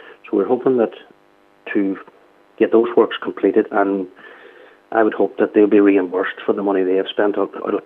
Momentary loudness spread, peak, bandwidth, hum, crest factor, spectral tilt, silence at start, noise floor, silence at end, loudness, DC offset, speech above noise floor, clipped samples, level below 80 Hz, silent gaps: 9 LU; -2 dBFS; 3.9 kHz; none; 16 dB; -8.5 dB/octave; 0.05 s; -54 dBFS; 0.05 s; -18 LUFS; under 0.1%; 37 dB; under 0.1%; -78 dBFS; none